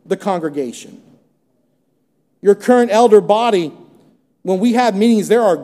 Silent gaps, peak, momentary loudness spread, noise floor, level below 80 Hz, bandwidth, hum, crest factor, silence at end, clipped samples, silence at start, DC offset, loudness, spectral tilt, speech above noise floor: none; 0 dBFS; 15 LU; -64 dBFS; -72 dBFS; 14 kHz; none; 16 dB; 0 s; under 0.1%; 0.1 s; under 0.1%; -14 LUFS; -5.5 dB/octave; 50 dB